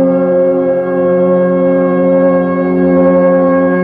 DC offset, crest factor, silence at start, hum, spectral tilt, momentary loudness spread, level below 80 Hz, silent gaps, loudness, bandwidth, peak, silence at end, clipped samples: under 0.1%; 10 dB; 0 s; none; -12 dB/octave; 4 LU; -48 dBFS; none; -10 LUFS; 3.5 kHz; 0 dBFS; 0 s; under 0.1%